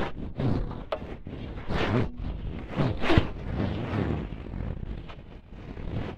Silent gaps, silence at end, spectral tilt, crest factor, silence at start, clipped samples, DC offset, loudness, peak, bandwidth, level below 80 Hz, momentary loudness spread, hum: none; 0 s; -8 dB/octave; 26 dB; 0 s; under 0.1%; under 0.1%; -31 LUFS; -4 dBFS; 8.8 kHz; -38 dBFS; 15 LU; none